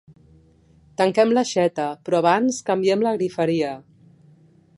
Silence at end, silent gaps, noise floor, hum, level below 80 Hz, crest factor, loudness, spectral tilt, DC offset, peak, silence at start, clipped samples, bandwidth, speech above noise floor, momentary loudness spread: 1 s; none; -54 dBFS; none; -64 dBFS; 18 dB; -21 LUFS; -5 dB/octave; under 0.1%; -4 dBFS; 1 s; under 0.1%; 11.5 kHz; 34 dB; 9 LU